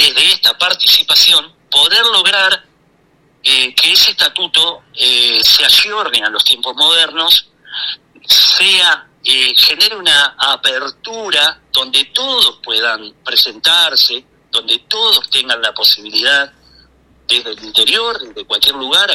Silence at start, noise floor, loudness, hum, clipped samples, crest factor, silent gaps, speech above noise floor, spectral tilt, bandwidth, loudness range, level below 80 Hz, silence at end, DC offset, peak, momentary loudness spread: 0 s; -53 dBFS; -9 LUFS; none; under 0.1%; 12 dB; none; 41 dB; 1 dB/octave; 17 kHz; 4 LU; -52 dBFS; 0 s; under 0.1%; 0 dBFS; 11 LU